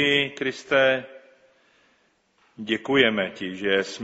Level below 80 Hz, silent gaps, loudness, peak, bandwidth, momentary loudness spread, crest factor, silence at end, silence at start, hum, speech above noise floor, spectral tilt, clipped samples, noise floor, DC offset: -64 dBFS; none; -23 LUFS; -4 dBFS; 8 kHz; 10 LU; 22 dB; 0 s; 0 s; none; 42 dB; -1.5 dB/octave; under 0.1%; -65 dBFS; under 0.1%